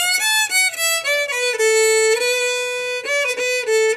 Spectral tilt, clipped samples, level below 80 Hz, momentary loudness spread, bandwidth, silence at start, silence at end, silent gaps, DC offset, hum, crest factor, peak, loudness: 3 dB/octave; under 0.1%; -74 dBFS; 5 LU; 16 kHz; 0 s; 0 s; none; under 0.1%; none; 14 dB; -4 dBFS; -17 LUFS